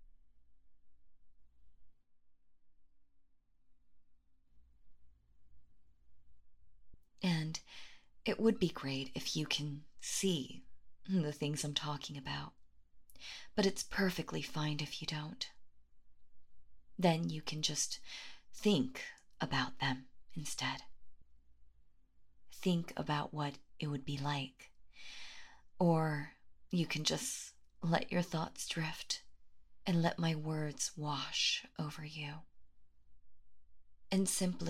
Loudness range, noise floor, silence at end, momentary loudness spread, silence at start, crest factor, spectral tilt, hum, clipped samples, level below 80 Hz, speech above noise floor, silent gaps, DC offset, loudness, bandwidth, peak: 5 LU; -65 dBFS; 0 s; 16 LU; 0 s; 24 dB; -4 dB/octave; none; under 0.1%; -66 dBFS; 28 dB; none; under 0.1%; -38 LUFS; 16 kHz; -16 dBFS